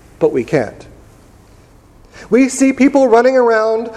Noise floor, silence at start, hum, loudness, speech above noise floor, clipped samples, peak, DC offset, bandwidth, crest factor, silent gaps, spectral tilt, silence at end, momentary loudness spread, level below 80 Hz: -44 dBFS; 0.2 s; none; -12 LUFS; 32 dB; under 0.1%; 0 dBFS; under 0.1%; 12.5 kHz; 14 dB; none; -5.5 dB/octave; 0 s; 8 LU; -48 dBFS